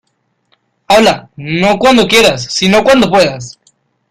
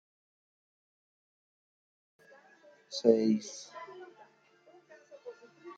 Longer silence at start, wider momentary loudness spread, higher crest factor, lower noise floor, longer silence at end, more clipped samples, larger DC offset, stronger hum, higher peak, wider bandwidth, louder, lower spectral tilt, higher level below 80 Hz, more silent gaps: second, 0.9 s vs 2.9 s; second, 12 LU vs 25 LU; second, 12 dB vs 28 dB; about the same, -63 dBFS vs -64 dBFS; first, 0.6 s vs 0.05 s; neither; neither; neither; first, 0 dBFS vs -10 dBFS; first, 16.5 kHz vs 8.8 kHz; first, -9 LUFS vs -30 LUFS; second, -4 dB/octave vs -5.5 dB/octave; first, -42 dBFS vs -88 dBFS; neither